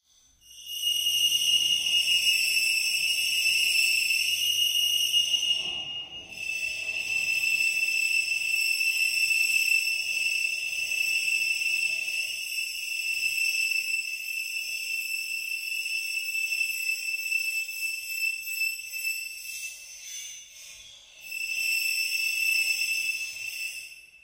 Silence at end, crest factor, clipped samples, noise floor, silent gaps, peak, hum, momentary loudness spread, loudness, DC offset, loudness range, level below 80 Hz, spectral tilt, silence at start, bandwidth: 0.05 s; 16 dB; under 0.1%; -59 dBFS; none; -12 dBFS; none; 13 LU; -25 LUFS; under 0.1%; 7 LU; -70 dBFS; 4 dB/octave; 0.45 s; 16 kHz